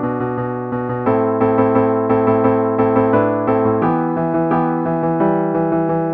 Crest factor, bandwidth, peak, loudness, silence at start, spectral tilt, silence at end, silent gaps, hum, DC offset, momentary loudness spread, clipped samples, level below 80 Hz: 14 dB; 4.5 kHz; -2 dBFS; -16 LUFS; 0 s; -12 dB/octave; 0 s; none; none; under 0.1%; 6 LU; under 0.1%; -48 dBFS